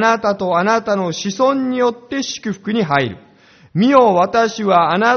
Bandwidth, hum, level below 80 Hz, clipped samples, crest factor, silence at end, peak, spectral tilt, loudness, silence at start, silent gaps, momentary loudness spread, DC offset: 6.8 kHz; none; -56 dBFS; under 0.1%; 16 dB; 0 s; 0 dBFS; -4 dB/octave; -16 LUFS; 0 s; none; 11 LU; under 0.1%